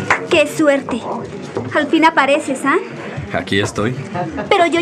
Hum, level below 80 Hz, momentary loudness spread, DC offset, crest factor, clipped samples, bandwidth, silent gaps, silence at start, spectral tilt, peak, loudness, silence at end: none; -52 dBFS; 13 LU; under 0.1%; 16 dB; under 0.1%; 14.5 kHz; none; 0 s; -4.5 dB/octave; 0 dBFS; -16 LUFS; 0 s